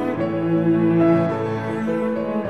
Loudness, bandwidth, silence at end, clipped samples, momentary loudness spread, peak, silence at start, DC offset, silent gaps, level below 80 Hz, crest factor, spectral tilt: -20 LUFS; 6 kHz; 0 s; under 0.1%; 7 LU; -6 dBFS; 0 s; 0.3%; none; -54 dBFS; 14 dB; -9.5 dB/octave